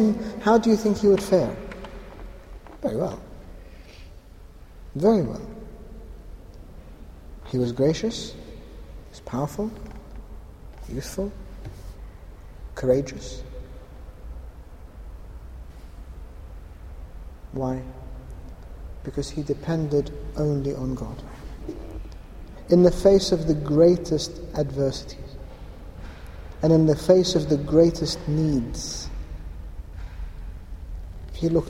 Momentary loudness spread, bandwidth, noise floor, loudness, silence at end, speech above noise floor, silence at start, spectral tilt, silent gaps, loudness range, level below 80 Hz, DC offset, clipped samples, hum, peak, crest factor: 26 LU; 16 kHz; -45 dBFS; -23 LUFS; 0 s; 23 dB; 0 s; -6.5 dB/octave; none; 15 LU; -38 dBFS; under 0.1%; under 0.1%; none; -4 dBFS; 22 dB